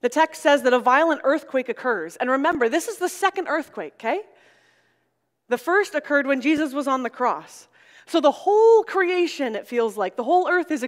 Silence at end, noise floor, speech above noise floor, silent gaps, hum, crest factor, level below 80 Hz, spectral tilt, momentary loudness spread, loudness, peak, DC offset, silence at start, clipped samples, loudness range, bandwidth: 0 s; -73 dBFS; 52 dB; none; none; 20 dB; -70 dBFS; -3 dB/octave; 10 LU; -21 LUFS; -2 dBFS; under 0.1%; 0.05 s; under 0.1%; 5 LU; 16 kHz